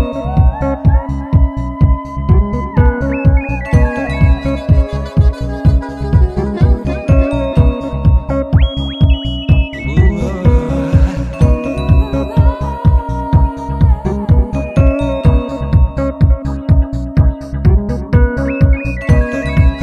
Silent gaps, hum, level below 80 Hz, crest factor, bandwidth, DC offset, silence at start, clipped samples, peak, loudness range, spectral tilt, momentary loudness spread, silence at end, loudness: none; none; -14 dBFS; 12 dB; 6.6 kHz; 0.2%; 0 s; under 0.1%; 0 dBFS; 1 LU; -8.5 dB/octave; 3 LU; 0 s; -14 LUFS